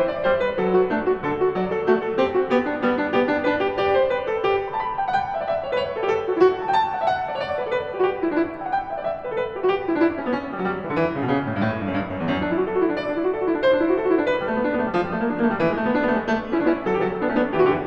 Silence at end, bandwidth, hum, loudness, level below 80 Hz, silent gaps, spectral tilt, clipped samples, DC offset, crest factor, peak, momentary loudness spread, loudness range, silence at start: 0 s; 7 kHz; none; -22 LUFS; -50 dBFS; none; -7.5 dB/octave; under 0.1%; under 0.1%; 16 dB; -6 dBFS; 6 LU; 3 LU; 0 s